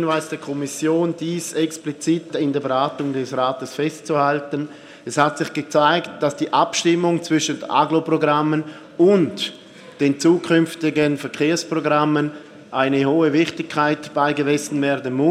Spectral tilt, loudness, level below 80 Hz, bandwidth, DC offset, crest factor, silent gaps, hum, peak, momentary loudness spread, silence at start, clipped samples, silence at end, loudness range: -5 dB/octave; -20 LUFS; -68 dBFS; 14 kHz; under 0.1%; 18 dB; none; none; -2 dBFS; 9 LU; 0 s; under 0.1%; 0 s; 3 LU